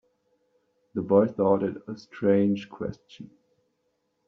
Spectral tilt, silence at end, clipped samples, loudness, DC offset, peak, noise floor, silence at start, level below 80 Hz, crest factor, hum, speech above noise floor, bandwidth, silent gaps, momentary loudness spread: -7.5 dB/octave; 1 s; under 0.1%; -25 LUFS; under 0.1%; -6 dBFS; -75 dBFS; 0.95 s; -66 dBFS; 20 dB; none; 50 dB; 6.4 kHz; none; 16 LU